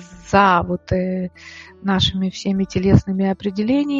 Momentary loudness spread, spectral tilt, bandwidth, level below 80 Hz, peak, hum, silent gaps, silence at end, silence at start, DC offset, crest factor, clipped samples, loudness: 12 LU; -6.5 dB/octave; 7.6 kHz; -38 dBFS; 0 dBFS; none; none; 0 s; 0 s; under 0.1%; 18 dB; under 0.1%; -19 LUFS